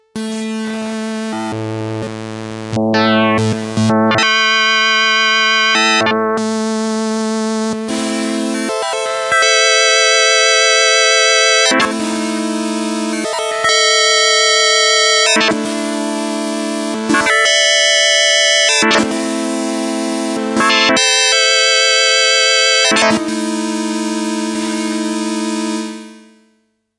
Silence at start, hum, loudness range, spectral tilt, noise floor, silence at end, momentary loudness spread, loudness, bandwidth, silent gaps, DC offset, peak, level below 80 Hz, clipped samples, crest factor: 0.15 s; none; 7 LU; -2 dB/octave; -61 dBFS; 0.8 s; 12 LU; -12 LUFS; 11.5 kHz; none; under 0.1%; 0 dBFS; -58 dBFS; under 0.1%; 14 dB